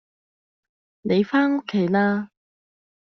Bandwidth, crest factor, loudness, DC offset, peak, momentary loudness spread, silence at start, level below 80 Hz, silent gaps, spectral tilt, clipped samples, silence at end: 6.2 kHz; 16 dB; -22 LUFS; under 0.1%; -8 dBFS; 11 LU; 1.05 s; -66 dBFS; none; -5.5 dB/octave; under 0.1%; 0.8 s